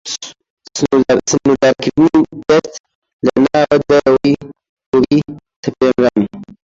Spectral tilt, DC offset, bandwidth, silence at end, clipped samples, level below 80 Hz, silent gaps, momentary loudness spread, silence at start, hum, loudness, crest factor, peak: -5 dB/octave; under 0.1%; 7.8 kHz; 0.2 s; under 0.1%; -46 dBFS; 0.50-0.57 s, 2.80-2.84 s, 2.95-3.02 s, 3.13-3.19 s, 4.69-4.77 s, 4.86-4.92 s, 5.56-5.63 s; 13 LU; 0.05 s; none; -13 LUFS; 14 dB; 0 dBFS